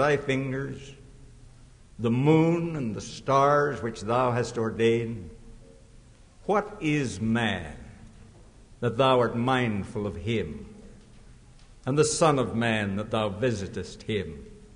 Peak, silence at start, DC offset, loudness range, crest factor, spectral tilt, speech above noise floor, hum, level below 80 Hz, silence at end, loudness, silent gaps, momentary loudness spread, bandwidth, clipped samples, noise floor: -10 dBFS; 0 s; under 0.1%; 4 LU; 18 dB; -5.5 dB/octave; 26 dB; none; -50 dBFS; 0.1 s; -26 LUFS; none; 16 LU; 10.5 kHz; under 0.1%; -52 dBFS